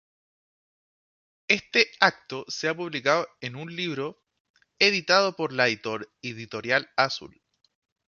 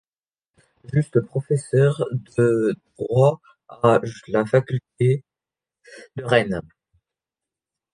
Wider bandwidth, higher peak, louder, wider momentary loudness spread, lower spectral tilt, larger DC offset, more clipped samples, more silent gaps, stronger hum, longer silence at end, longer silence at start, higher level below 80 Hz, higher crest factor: second, 7.2 kHz vs 10.5 kHz; about the same, -2 dBFS vs -2 dBFS; second, -25 LUFS vs -21 LUFS; first, 15 LU vs 10 LU; second, -3 dB/octave vs -7.5 dB/octave; neither; neither; first, 4.40-4.54 s vs none; neither; second, 0.85 s vs 1.3 s; first, 1.5 s vs 0.9 s; second, -72 dBFS vs -56 dBFS; first, 26 dB vs 20 dB